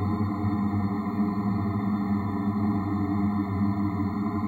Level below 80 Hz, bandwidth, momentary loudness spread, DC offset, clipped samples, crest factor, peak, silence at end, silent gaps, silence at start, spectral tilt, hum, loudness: -52 dBFS; 4.6 kHz; 1 LU; under 0.1%; under 0.1%; 12 dB; -14 dBFS; 0 s; none; 0 s; -10 dB/octave; none; -27 LUFS